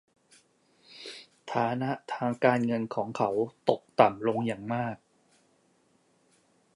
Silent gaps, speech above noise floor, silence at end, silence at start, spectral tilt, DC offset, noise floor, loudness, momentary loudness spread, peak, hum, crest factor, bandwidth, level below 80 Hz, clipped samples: none; 40 dB; 1.8 s; 0.9 s; -7 dB/octave; under 0.1%; -68 dBFS; -29 LUFS; 19 LU; -6 dBFS; none; 26 dB; 11 kHz; -72 dBFS; under 0.1%